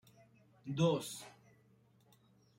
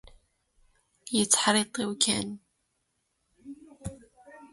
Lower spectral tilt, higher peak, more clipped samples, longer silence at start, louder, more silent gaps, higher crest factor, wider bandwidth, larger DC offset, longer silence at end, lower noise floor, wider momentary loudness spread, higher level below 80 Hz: first, -6 dB/octave vs -2 dB/octave; second, -20 dBFS vs -6 dBFS; neither; second, 0.65 s vs 1.05 s; second, -37 LUFS vs -25 LUFS; neither; about the same, 22 dB vs 26 dB; first, 16 kHz vs 12 kHz; neither; first, 1.25 s vs 0.05 s; second, -69 dBFS vs -77 dBFS; second, 20 LU vs 26 LU; second, -76 dBFS vs -60 dBFS